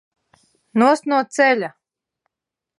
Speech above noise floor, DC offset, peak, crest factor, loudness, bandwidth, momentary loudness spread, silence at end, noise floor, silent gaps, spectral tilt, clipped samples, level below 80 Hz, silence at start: 69 dB; under 0.1%; -2 dBFS; 18 dB; -18 LUFS; 11.5 kHz; 8 LU; 1.1 s; -86 dBFS; none; -4.5 dB/octave; under 0.1%; -80 dBFS; 0.75 s